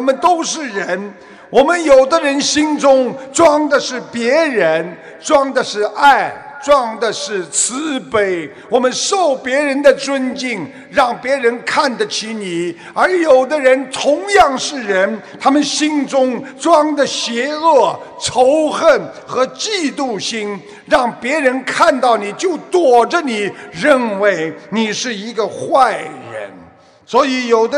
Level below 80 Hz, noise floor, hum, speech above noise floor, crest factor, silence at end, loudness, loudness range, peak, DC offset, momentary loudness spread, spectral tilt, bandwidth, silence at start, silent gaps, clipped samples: -52 dBFS; -43 dBFS; none; 29 dB; 14 dB; 0 s; -14 LUFS; 3 LU; 0 dBFS; under 0.1%; 10 LU; -3 dB/octave; 11 kHz; 0 s; none; under 0.1%